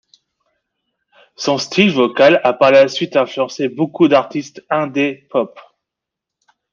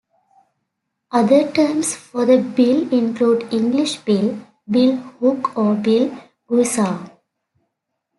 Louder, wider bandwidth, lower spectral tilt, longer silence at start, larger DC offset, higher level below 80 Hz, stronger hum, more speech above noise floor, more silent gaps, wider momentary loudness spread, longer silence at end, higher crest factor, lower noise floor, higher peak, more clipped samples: first, -15 LUFS vs -18 LUFS; second, 7.4 kHz vs 12 kHz; about the same, -5 dB/octave vs -5 dB/octave; first, 1.4 s vs 1.1 s; neither; about the same, -62 dBFS vs -66 dBFS; neither; first, 68 dB vs 59 dB; neither; first, 10 LU vs 7 LU; about the same, 1.15 s vs 1.1 s; about the same, 16 dB vs 16 dB; first, -82 dBFS vs -76 dBFS; about the same, -2 dBFS vs -2 dBFS; neither